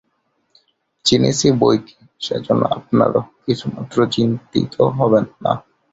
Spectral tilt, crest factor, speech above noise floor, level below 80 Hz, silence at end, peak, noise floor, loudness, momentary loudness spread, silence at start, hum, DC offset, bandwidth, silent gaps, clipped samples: -5.5 dB/octave; 18 dB; 50 dB; -50 dBFS; 0.35 s; -2 dBFS; -67 dBFS; -18 LUFS; 8 LU; 1.05 s; none; under 0.1%; 8 kHz; none; under 0.1%